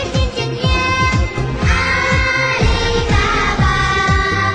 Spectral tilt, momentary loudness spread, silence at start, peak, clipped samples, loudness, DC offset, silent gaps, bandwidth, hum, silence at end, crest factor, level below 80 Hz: -5 dB/octave; 4 LU; 0 s; -4 dBFS; under 0.1%; -15 LUFS; under 0.1%; none; 9.6 kHz; none; 0 s; 10 dB; -22 dBFS